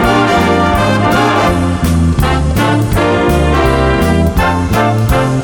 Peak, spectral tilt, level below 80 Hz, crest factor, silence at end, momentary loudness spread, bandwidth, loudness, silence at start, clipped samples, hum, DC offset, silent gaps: 0 dBFS; -6 dB/octave; -20 dBFS; 10 dB; 0 s; 2 LU; 17.5 kHz; -11 LUFS; 0 s; under 0.1%; none; under 0.1%; none